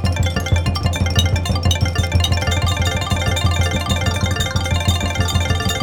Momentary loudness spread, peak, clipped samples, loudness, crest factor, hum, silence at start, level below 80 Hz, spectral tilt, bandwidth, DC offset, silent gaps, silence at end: 2 LU; 0 dBFS; under 0.1%; -18 LUFS; 16 dB; none; 0 s; -26 dBFS; -4.5 dB/octave; 18.5 kHz; under 0.1%; none; 0 s